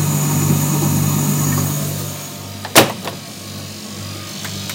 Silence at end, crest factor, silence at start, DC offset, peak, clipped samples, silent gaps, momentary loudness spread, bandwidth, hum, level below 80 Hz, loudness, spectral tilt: 0 s; 18 dB; 0 s; under 0.1%; 0 dBFS; under 0.1%; none; 16 LU; 17 kHz; none; -50 dBFS; -17 LUFS; -4 dB/octave